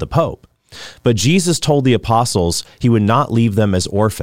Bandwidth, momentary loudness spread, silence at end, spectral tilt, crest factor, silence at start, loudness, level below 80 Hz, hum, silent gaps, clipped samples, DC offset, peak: 16 kHz; 6 LU; 0 s; -5.5 dB/octave; 12 dB; 0 s; -15 LUFS; -40 dBFS; none; none; under 0.1%; 0.8%; -2 dBFS